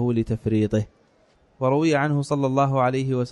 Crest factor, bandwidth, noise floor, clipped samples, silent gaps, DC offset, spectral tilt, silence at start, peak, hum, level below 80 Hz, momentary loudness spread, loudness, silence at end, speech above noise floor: 14 dB; 11 kHz; -60 dBFS; under 0.1%; none; under 0.1%; -7.5 dB/octave; 0 s; -8 dBFS; none; -50 dBFS; 5 LU; -22 LUFS; 0 s; 38 dB